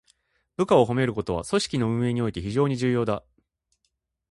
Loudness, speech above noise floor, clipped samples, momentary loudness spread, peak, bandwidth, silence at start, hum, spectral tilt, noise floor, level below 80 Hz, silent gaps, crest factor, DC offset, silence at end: -24 LUFS; 53 dB; under 0.1%; 9 LU; -6 dBFS; 11.5 kHz; 0.6 s; none; -6.5 dB/octave; -76 dBFS; -50 dBFS; none; 20 dB; under 0.1%; 1.15 s